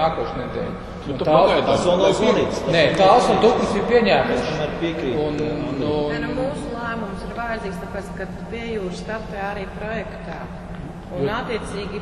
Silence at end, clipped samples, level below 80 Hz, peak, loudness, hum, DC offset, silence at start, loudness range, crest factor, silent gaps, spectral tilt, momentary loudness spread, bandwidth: 0 s; under 0.1%; -40 dBFS; -2 dBFS; -21 LUFS; none; under 0.1%; 0 s; 12 LU; 20 dB; none; -5.5 dB/octave; 15 LU; 12 kHz